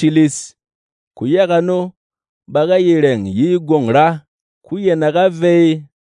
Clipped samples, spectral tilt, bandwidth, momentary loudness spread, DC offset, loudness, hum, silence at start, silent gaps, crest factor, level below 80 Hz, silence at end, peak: under 0.1%; -6.5 dB/octave; 11 kHz; 13 LU; under 0.1%; -14 LUFS; none; 0 s; 0.75-1.11 s, 1.97-2.10 s, 2.29-2.41 s, 4.28-4.61 s; 14 dB; -64 dBFS; 0.2 s; 0 dBFS